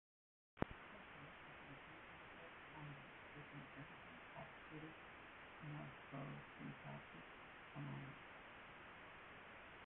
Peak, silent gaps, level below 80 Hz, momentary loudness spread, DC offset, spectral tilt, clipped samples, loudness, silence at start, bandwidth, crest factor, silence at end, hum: -20 dBFS; none; -74 dBFS; 6 LU; under 0.1%; -4.5 dB/octave; under 0.1%; -56 LUFS; 0.55 s; 4 kHz; 36 dB; 0 s; none